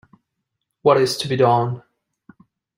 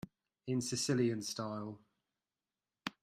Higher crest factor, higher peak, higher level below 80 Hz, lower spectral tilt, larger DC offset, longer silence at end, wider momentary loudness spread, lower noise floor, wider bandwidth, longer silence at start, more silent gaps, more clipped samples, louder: about the same, 18 dB vs 18 dB; first, -2 dBFS vs -22 dBFS; first, -62 dBFS vs -76 dBFS; about the same, -5.5 dB/octave vs -4.5 dB/octave; neither; first, 1 s vs 0.15 s; second, 9 LU vs 19 LU; second, -78 dBFS vs under -90 dBFS; about the same, 16 kHz vs 15.5 kHz; first, 0.85 s vs 0.05 s; neither; neither; first, -18 LUFS vs -37 LUFS